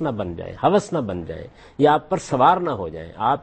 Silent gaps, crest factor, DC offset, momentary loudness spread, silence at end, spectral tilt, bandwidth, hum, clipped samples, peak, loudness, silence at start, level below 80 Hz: none; 18 dB; under 0.1%; 15 LU; 0 s; -6.5 dB/octave; 8.8 kHz; none; under 0.1%; -4 dBFS; -21 LUFS; 0 s; -48 dBFS